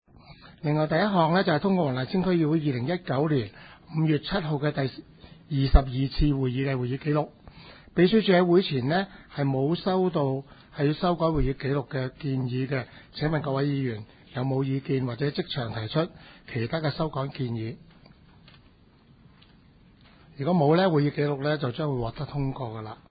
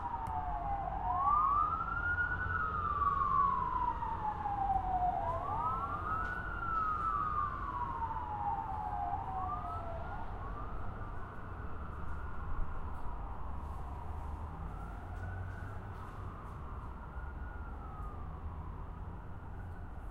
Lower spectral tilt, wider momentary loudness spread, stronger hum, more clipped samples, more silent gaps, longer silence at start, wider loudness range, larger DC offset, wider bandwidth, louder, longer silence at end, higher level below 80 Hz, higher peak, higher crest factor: first, -11.5 dB/octave vs -8 dB/octave; second, 11 LU vs 14 LU; neither; neither; neither; first, 0.3 s vs 0 s; second, 7 LU vs 13 LU; neither; second, 5 kHz vs 10.5 kHz; first, -26 LUFS vs -38 LUFS; first, 0.15 s vs 0 s; first, -38 dBFS vs -46 dBFS; first, -2 dBFS vs -20 dBFS; first, 24 dB vs 16 dB